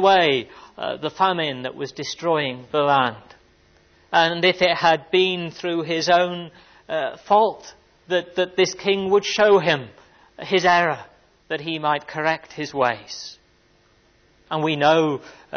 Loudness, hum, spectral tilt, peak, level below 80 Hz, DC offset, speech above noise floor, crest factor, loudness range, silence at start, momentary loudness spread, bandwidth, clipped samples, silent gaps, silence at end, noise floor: -21 LUFS; none; -4 dB/octave; -4 dBFS; -62 dBFS; under 0.1%; 38 dB; 18 dB; 4 LU; 0 s; 13 LU; 6.6 kHz; under 0.1%; none; 0 s; -59 dBFS